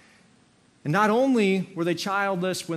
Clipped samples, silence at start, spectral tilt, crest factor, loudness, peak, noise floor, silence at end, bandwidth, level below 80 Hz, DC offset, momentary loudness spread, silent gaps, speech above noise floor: under 0.1%; 0.85 s; -5.5 dB/octave; 16 dB; -24 LUFS; -8 dBFS; -60 dBFS; 0 s; 14 kHz; -74 dBFS; under 0.1%; 7 LU; none; 36 dB